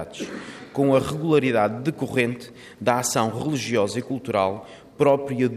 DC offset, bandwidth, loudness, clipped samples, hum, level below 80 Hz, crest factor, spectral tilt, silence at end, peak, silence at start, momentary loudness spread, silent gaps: under 0.1%; 15.5 kHz; -23 LUFS; under 0.1%; none; -60 dBFS; 18 dB; -5 dB/octave; 0 s; -6 dBFS; 0 s; 13 LU; none